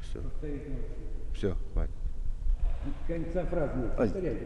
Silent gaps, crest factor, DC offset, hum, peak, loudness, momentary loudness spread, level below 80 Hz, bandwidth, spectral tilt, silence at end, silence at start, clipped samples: none; 14 dB; under 0.1%; none; -16 dBFS; -35 LUFS; 11 LU; -32 dBFS; 6.4 kHz; -8.5 dB/octave; 0 s; 0 s; under 0.1%